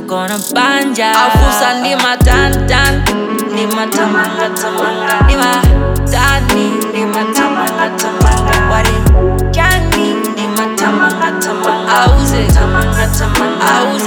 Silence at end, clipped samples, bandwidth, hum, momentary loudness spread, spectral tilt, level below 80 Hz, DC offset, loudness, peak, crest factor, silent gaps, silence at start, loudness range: 0 s; under 0.1%; 19 kHz; none; 5 LU; -4.5 dB/octave; -16 dBFS; under 0.1%; -11 LUFS; 0 dBFS; 10 dB; none; 0 s; 1 LU